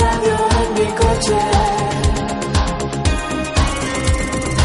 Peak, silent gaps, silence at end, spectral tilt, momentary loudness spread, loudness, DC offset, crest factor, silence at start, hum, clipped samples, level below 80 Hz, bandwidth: -2 dBFS; none; 0 s; -5 dB/octave; 4 LU; -17 LUFS; under 0.1%; 14 dB; 0 s; none; under 0.1%; -22 dBFS; 11.5 kHz